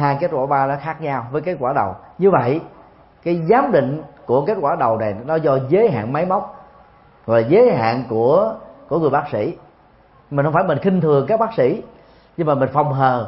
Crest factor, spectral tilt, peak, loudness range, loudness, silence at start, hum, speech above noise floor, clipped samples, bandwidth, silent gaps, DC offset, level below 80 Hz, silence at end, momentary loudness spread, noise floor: 18 dB; -12.5 dB/octave; 0 dBFS; 2 LU; -18 LUFS; 0 s; none; 33 dB; under 0.1%; 5.8 kHz; none; under 0.1%; -54 dBFS; 0 s; 10 LU; -50 dBFS